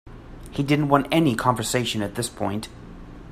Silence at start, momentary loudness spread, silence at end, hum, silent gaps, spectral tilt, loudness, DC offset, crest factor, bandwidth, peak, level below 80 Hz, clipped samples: 0.05 s; 23 LU; 0 s; none; none; -5 dB/octave; -23 LUFS; under 0.1%; 22 dB; 16 kHz; -2 dBFS; -46 dBFS; under 0.1%